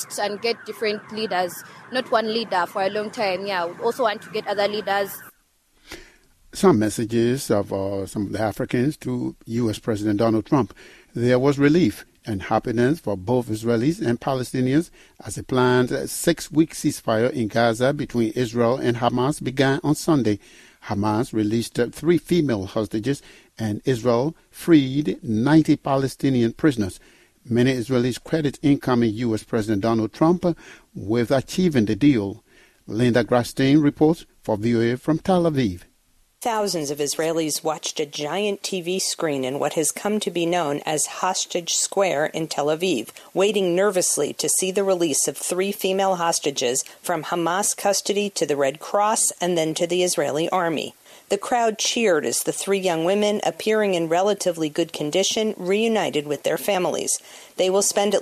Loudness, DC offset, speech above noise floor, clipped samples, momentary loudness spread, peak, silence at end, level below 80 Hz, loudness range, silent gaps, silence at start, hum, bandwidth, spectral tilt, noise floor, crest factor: -22 LUFS; under 0.1%; 40 dB; under 0.1%; 8 LU; -4 dBFS; 0 s; -54 dBFS; 3 LU; none; 0 s; none; 14.5 kHz; -4.5 dB/octave; -62 dBFS; 18 dB